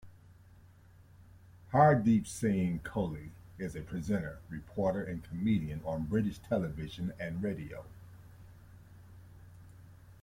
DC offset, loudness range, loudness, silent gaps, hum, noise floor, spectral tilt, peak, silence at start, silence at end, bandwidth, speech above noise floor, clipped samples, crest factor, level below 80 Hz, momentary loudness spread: under 0.1%; 9 LU; -33 LUFS; none; none; -58 dBFS; -7.5 dB/octave; -12 dBFS; 0.05 s; 0.1 s; 16.5 kHz; 26 dB; under 0.1%; 22 dB; -56 dBFS; 19 LU